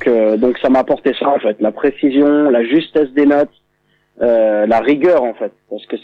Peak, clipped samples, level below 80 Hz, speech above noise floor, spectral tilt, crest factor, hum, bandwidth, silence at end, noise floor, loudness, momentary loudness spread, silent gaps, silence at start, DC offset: -2 dBFS; under 0.1%; -50 dBFS; 47 dB; -7.5 dB/octave; 12 dB; 50 Hz at -55 dBFS; 5.2 kHz; 0.05 s; -60 dBFS; -14 LUFS; 8 LU; none; 0 s; under 0.1%